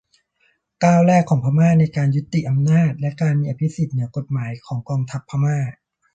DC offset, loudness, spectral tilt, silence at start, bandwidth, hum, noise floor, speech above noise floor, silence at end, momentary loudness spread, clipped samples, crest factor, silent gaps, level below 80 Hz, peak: under 0.1%; -19 LUFS; -8 dB/octave; 0.8 s; 8.4 kHz; none; -64 dBFS; 46 dB; 0.4 s; 11 LU; under 0.1%; 16 dB; none; -54 dBFS; -2 dBFS